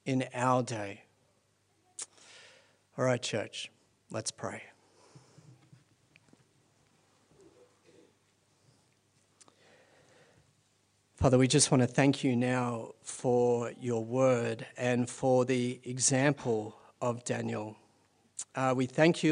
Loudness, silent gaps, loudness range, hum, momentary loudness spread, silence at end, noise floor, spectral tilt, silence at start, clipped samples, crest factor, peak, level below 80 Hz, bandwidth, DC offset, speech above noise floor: -30 LUFS; none; 12 LU; none; 18 LU; 0 s; -72 dBFS; -5 dB/octave; 0.05 s; under 0.1%; 24 dB; -10 dBFS; -64 dBFS; 10.5 kHz; under 0.1%; 42 dB